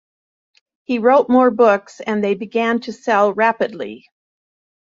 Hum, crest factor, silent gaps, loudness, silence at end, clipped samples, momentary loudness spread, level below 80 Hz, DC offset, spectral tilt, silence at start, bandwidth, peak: none; 16 dB; none; -16 LUFS; 0.85 s; under 0.1%; 11 LU; -66 dBFS; under 0.1%; -6 dB/octave; 0.9 s; 7.6 kHz; -2 dBFS